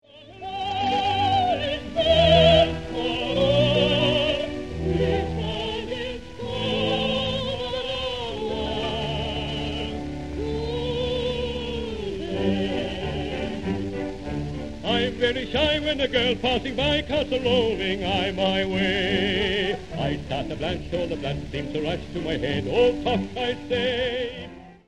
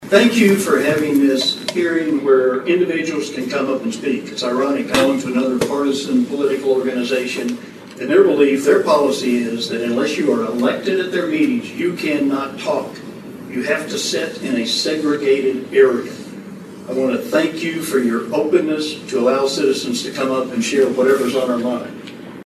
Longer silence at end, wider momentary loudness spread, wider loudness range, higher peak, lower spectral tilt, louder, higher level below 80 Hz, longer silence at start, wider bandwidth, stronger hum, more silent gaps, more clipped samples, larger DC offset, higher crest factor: about the same, 0 s vs 0 s; about the same, 10 LU vs 9 LU; first, 8 LU vs 4 LU; second, -4 dBFS vs 0 dBFS; first, -6 dB/octave vs -4.5 dB/octave; second, -24 LUFS vs -17 LUFS; first, -40 dBFS vs -62 dBFS; about the same, 0 s vs 0 s; second, 11.5 kHz vs 13.5 kHz; neither; neither; neither; first, 0.5% vs under 0.1%; about the same, 20 dB vs 16 dB